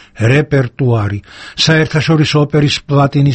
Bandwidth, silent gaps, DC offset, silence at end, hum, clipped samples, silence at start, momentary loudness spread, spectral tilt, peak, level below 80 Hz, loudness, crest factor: 8.6 kHz; none; under 0.1%; 0 s; none; under 0.1%; 0.15 s; 6 LU; -6 dB/octave; 0 dBFS; -40 dBFS; -12 LUFS; 12 dB